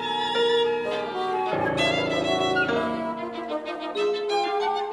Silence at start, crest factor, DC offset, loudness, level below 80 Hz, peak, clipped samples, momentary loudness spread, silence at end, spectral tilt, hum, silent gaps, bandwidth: 0 s; 14 dB; under 0.1%; -25 LUFS; -58 dBFS; -10 dBFS; under 0.1%; 8 LU; 0 s; -4.5 dB/octave; none; none; 11.5 kHz